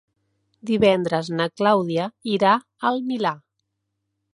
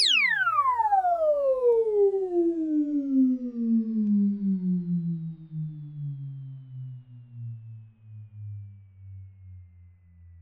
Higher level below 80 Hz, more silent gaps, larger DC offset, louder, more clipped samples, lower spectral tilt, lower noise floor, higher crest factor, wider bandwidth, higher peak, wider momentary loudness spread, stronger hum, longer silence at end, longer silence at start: about the same, -62 dBFS vs -66 dBFS; neither; neither; first, -21 LUFS vs -25 LUFS; neither; about the same, -6.5 dB/octave vs -5.5 dB/octave; first, -77 dBFS vs -53 dBFS; about the same, 18 dB vs 14 dB; about the same, 11 kHz vs 10.5 kHz; first, -4 dBFS vs -12 dBFS; second, 8 LU vs 20 LU; neither; first, 0.95 s vs 0 s; first, 0.65 s vs 0 s